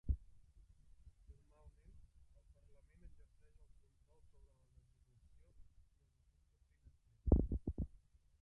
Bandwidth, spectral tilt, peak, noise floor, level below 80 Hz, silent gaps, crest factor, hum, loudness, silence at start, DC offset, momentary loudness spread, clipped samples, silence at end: 2 kHz; -12 dB/octave; -18 dBFS; -74 dBFS; -48 dBFS; none; 30 dB; none; -41 LUFS; 0.05 s; under 0.1%; 13 LU; under 0.1%; 0.55 s